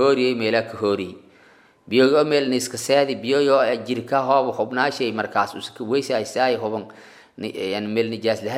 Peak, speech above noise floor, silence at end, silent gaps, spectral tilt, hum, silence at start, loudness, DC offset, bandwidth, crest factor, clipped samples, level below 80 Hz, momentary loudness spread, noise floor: -4 dBFS; 32 dB; 0 s; none; -4.5 dB/octave; none; 0 s; -21 LUFS; under 0.1%; 15.5 kHz; 18 dB; under 0.1%; -70 dBFS; 10 LU; -53 dBFS